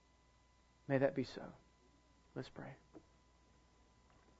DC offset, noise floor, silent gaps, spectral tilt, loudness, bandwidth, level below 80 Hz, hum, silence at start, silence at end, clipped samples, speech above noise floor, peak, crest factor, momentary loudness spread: under 0.1%; -71 dBFS; none; -6 dB/octave; -41 LUFS; 7.6 kHz; -72 dBFS; none; 0.9 s; 1.4 s; under 0.1%; 30 dB; -20 dBFS; 26 dB; 21 LU